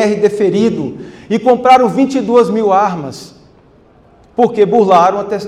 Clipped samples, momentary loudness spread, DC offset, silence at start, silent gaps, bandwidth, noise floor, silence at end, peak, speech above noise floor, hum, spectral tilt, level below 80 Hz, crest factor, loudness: under 0.1%; 15 LU; under 0.1%; 0 s; none; 12 kHz; -45 dBFS; 0 s; 0 dBFS; 34 dB; none; -6.5 dB/octave; -52 dBFS; 12 dB; -11 LUFS